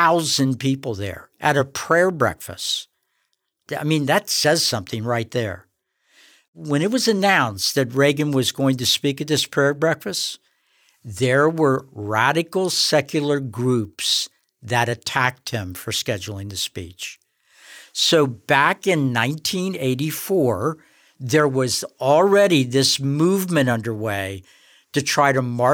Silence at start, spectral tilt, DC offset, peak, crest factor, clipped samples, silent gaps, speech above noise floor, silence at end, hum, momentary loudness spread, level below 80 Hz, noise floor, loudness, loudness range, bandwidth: 0 s; -4 dB/octave; under 0.1%; -4 dBFS; 16 dB; under 0.1%; 6.48-6.53 s; 52 dB; 0 s; none; 11 LU; -60 dBFS; -72 dBFS; -20 LUFS; 4 LU; over 20 kHz